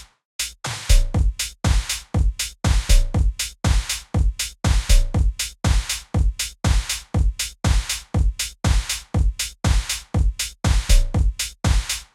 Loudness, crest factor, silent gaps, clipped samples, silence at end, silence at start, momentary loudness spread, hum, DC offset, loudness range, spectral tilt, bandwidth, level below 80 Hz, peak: -22 LUFS; 16 dB; 0.25-0.39 s; under 0.1%; 0.1 s; 0 s; 5 LU; none; under 0.1%; 1 LU; -3.5 dB/octave; 16 kHz; -22 dBFS; -4 dBFS